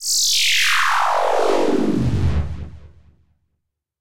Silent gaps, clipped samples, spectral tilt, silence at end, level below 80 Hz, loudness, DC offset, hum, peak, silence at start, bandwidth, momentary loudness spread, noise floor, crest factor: none; under 0.1%; -3 dB/octave; 0 s; -36 dBFS; -17 LUFS; 4%; none; -4 dBFS; 0 s; 16.5 kHz; 13 LU; -75 dBFS; 14 dB